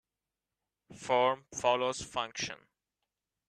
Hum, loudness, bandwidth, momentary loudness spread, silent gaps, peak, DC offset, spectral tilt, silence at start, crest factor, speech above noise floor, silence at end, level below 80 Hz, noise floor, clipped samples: none; -32 LUFS; 12.5 kHz; 12 LU; none; -12 dBFS; under 0.1%; -2.5 dB/octave; 0.9 s; 22 dB; over 58 dB; 0.95 s; -70 dBFS; under -90 dBFS; under 0.1%